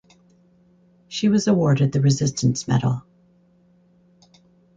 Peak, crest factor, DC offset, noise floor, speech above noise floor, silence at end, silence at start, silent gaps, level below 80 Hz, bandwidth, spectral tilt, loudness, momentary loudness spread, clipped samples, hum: -6 dBFS; 16 dB; under 0.1%; -57 dBFS; 38 dB; 1.75 s; 1.1 s; none; -56 dBFS; 9 kHz; -6 dB/octave; -20 LUFS; 7 LU; under 0.1%; none